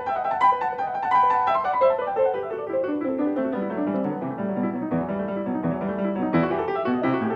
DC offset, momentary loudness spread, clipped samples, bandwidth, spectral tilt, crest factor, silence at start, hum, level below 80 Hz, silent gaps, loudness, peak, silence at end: under 0.1%; 7 LU; under 0.1%; 7.8 kHz; -8.5 dB/octave; 16 dB; 0 s; none; -58 dBFS; none; -24 LUFS; -8 dBFS; 0 s